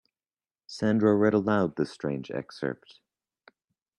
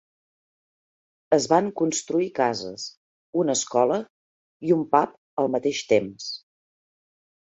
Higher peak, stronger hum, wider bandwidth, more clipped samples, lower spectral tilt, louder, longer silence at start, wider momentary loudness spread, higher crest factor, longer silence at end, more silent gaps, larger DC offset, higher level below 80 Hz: second, -10 dBFS vs -4 dBFS; neither; first, 10 kHz vs 8.2 kHz; neither; first, -7.5 dB/octave vs -4 dB/octave; second, -27 LUFS vs -24 LUFS; second, 0.7 s vs 1.3 s; about the same, 14 LU vs 14 LU; about the same, 18 dB vs 22 dB; first, 1.25 s vs 1.1 s; second, none vs 2.97-3.33 s, 4.10-4.60 s, 5.18-5.37 s; neither; about the same, -66 dBFS vs -68 dBFS